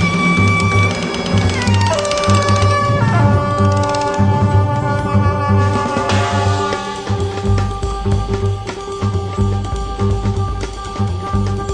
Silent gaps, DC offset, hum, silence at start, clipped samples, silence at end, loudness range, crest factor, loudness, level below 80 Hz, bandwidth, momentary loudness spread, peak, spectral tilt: none; under 0.1%; none; 0 s; under 0.1%; 0 s; 5 LU; 14 dB; -16 LUFS; -28 dBFS; 10 kHz; 8 LU; 0 dBFS; -6 dB/octave